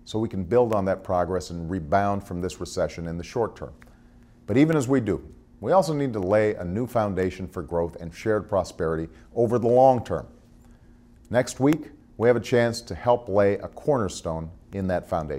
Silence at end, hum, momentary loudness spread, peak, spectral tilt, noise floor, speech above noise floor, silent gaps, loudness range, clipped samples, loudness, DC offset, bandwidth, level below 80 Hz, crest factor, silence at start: 0 s; none; 11 LU; -6 dBFS; -6.5 dB/octave; -52 dBFS; 28 dB; none; 3 LU; under 0.1%; -25 LUFS; under 0.1%; 15.5 kHz; -48 dBFS; 18 dB; 0.05 s